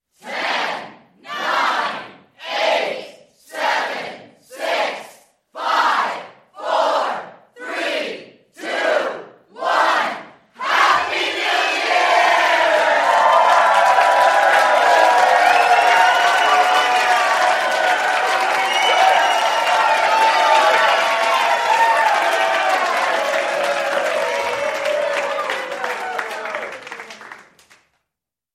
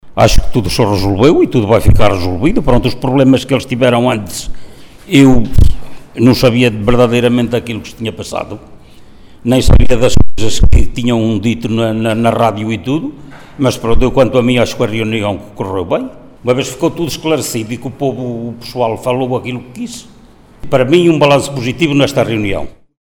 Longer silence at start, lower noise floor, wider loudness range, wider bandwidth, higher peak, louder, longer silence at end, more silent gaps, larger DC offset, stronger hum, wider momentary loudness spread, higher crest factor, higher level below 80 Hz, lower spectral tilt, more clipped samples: first, 0.25 s vs 0.05 s; first, -83 dBFS vs -40 dBFS; first, 9 LU vs 6 LU; about the same, 16 kHz vs 17 kHz; about the same, 0 dBFS vs 0 dBFS; second, -16 LUFS vs -13 LUFS; first, 1.15 s vs 0.35 s; neither; neither; neither; about the same, 15 LU vs 13 LU; first, 18 dB vs 10 dB; second, -70 dBFS vs -20 dBFS; second, -0.5 dB/octave vs -6 dB/octave; second, under 0.1% vs 0.4%